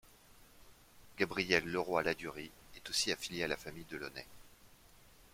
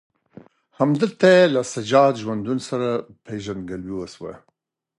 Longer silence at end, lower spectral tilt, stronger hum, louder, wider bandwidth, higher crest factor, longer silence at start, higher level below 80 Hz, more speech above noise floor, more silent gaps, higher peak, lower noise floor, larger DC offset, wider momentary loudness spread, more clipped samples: second, 0.05 s vs 0.6 s; second, -3 dB/octave vs -5.5 dB/octave; neither; second, -36 LUFS vs -20 LUFS; first, 16.5 kHz vs 11 kHz; first, 28 dB vs 18 dB; second, 0.05 s vs 0.8 s; second, -64 dBFS vs -58 dBFS; second, 24 dB vs 50 dB; neither; second, -12 dBFS vs -2 dBFS; second, -62 dBFS vs -70 dBFS; neither; about the same, 19 LU vs 18 LU; neither